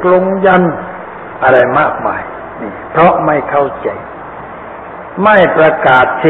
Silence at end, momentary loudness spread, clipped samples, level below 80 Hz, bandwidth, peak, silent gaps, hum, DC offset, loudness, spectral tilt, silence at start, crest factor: 0 s; 19 LU; 0.1%; -44 dBFS; 4.3 kHz; 0 dBFS; none; none; under 0.1%; -10 LUFS; -8.5 dB/octave; 0 s; 12 dB